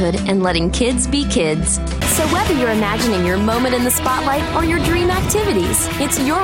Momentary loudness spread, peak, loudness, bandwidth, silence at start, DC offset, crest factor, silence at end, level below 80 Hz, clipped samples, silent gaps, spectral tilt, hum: 2 LU; -2 dBFS; -16 LUFS; 17 kHz; 0 s; under 0.1%; 14 dB; 0 s; -28 dBFS; under 0.1%; none; -4 dB/octave; none